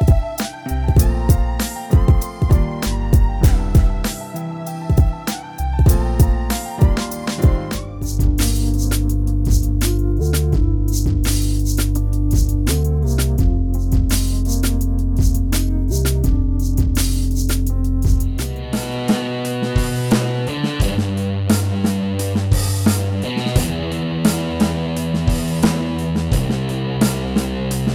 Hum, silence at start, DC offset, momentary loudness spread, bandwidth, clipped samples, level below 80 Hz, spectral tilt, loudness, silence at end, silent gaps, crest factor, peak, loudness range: none; 0 s; under 0.1%; 6 LU; over 20 kHz; under 0.1%; -20 dBFS; -6 dB/octave; -19 LUFS; 0 s; none; 14 dB; -4 dBFS; 2 LU